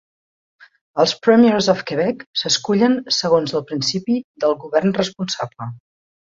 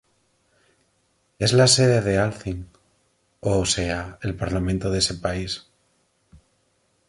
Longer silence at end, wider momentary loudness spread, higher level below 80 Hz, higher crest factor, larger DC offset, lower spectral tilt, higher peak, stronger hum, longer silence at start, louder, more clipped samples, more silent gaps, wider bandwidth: second, 0.55 s vs 0.7 s; second, 11 LU vs 16 LU; second, -60 dBFS vs -42 dBFS; about the same, 18 dB vs 20 dB; neither; about the same, -4.5 dB/octave vs -4 dB/octave; about the same, -2 dBFS vs -4 dBFS; neither; second, 0.95 s vs 1.4 s; first, -18 LUFS vs -22 LUFS; neither; first, 2.26-2.33 s, 4.24-4.34 s vs none; second, 7.8 kHz vs 11.5 kHz